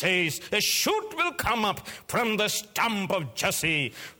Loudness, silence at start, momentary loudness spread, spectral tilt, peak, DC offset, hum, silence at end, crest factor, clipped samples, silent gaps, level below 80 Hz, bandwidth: -26 LUFS; 0 s; 5 LU; -2.5 dB/octave; -10 dBFS; under 0.1%; none; 0.05 s; 16 dB; under 0.1%; none; -56 dBFS; over 20 kHz